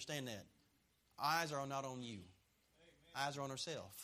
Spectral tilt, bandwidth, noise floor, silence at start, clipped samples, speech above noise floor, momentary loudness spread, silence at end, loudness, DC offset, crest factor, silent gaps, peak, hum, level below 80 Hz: -3.5 dB/octave; 15.5 kHz; -78 dBFS; 0 s; under 0.1%; 33 dB; 13 LU; 0 s; -44 LUFS; under 0.1%; 22 dB; none; -24 dBFS; none; -80 dBFS